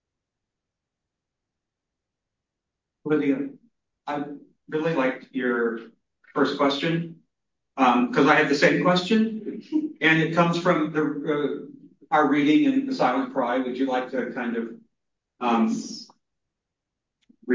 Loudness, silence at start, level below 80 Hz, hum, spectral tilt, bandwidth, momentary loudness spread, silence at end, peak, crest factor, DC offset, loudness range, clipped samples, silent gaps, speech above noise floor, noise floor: -23 LUFS; 3.05 s; -72 dBFS; none; -6 dB/octave; 7.6 kHz; 17 LU; 0 s; -2 dBFS; 22 dB; under 0.1%; 10 LU; under 0.1%; none; 62 dB; -85 dBFS